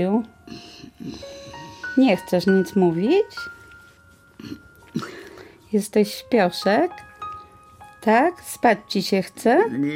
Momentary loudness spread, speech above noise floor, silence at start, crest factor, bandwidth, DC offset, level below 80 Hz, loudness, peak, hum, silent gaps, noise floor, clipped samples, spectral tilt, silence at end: 21 LU; 33 dB; 0 s; 18 dB; 16.5 kHz; under 0.1%; -60 dBFS; -21 LUFS; -4 dBFS; none; none; -52 dBFS; under 0.1%; -5.5 dB/octave; 0 s